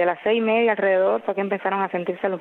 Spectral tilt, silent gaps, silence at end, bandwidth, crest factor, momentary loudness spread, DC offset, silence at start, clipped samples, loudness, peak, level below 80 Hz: -8 dB/octave; none; 0 s; 4.2 kHz; 12 dB; 6 LU; under 0.1%; 0 s; under 0.1%; -22 LUFS; -8 dBFS; -72 dBFS